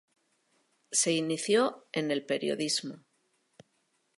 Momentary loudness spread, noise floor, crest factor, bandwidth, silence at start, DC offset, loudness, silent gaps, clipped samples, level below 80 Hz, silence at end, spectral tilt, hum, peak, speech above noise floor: 6 LU; -75 dBFS; 20 dB; 12 kHz; 0.9 s; under 0.1%; -29 LUFS; none; under 0.1%; -84 dBFS; 1.2 s; -3 dB/octave; none; -12 dBFS; 45 dB